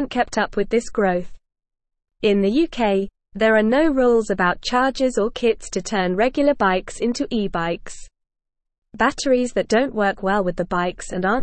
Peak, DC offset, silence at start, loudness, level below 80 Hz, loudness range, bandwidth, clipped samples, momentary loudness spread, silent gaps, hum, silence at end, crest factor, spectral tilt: -4 dBFS; 0.3%; 0 s; -20 LUFS; -42 dBFS; 4 LU; 8.8 kHz; under 0.1%; 7 LU; 8.78-8.82 s; none; 0 s; 16 dB; -5 dB/octave